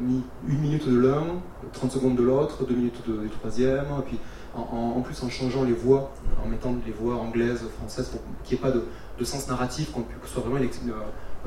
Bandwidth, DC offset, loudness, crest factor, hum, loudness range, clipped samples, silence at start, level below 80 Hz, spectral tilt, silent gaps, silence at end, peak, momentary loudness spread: 14.5 kHz; under 0.1%; -27 LUFS; 18 dB; none; 4 LU; under 0.1%; 0 s; -38 dBFS; -7 dB/octave; none; 0 s; -8 dBFS; 12 LU